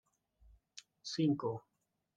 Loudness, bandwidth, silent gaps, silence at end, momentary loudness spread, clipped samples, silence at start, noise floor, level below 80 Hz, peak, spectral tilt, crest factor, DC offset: -38 LUFS; 9.2 kHz; none; 0.55 s; 22 LU; under 0.1%; 0.75 s; -68 dBFS; -72 dBFS; -22 dBFS; -6 dB/octave; 20 dB; under 0.1%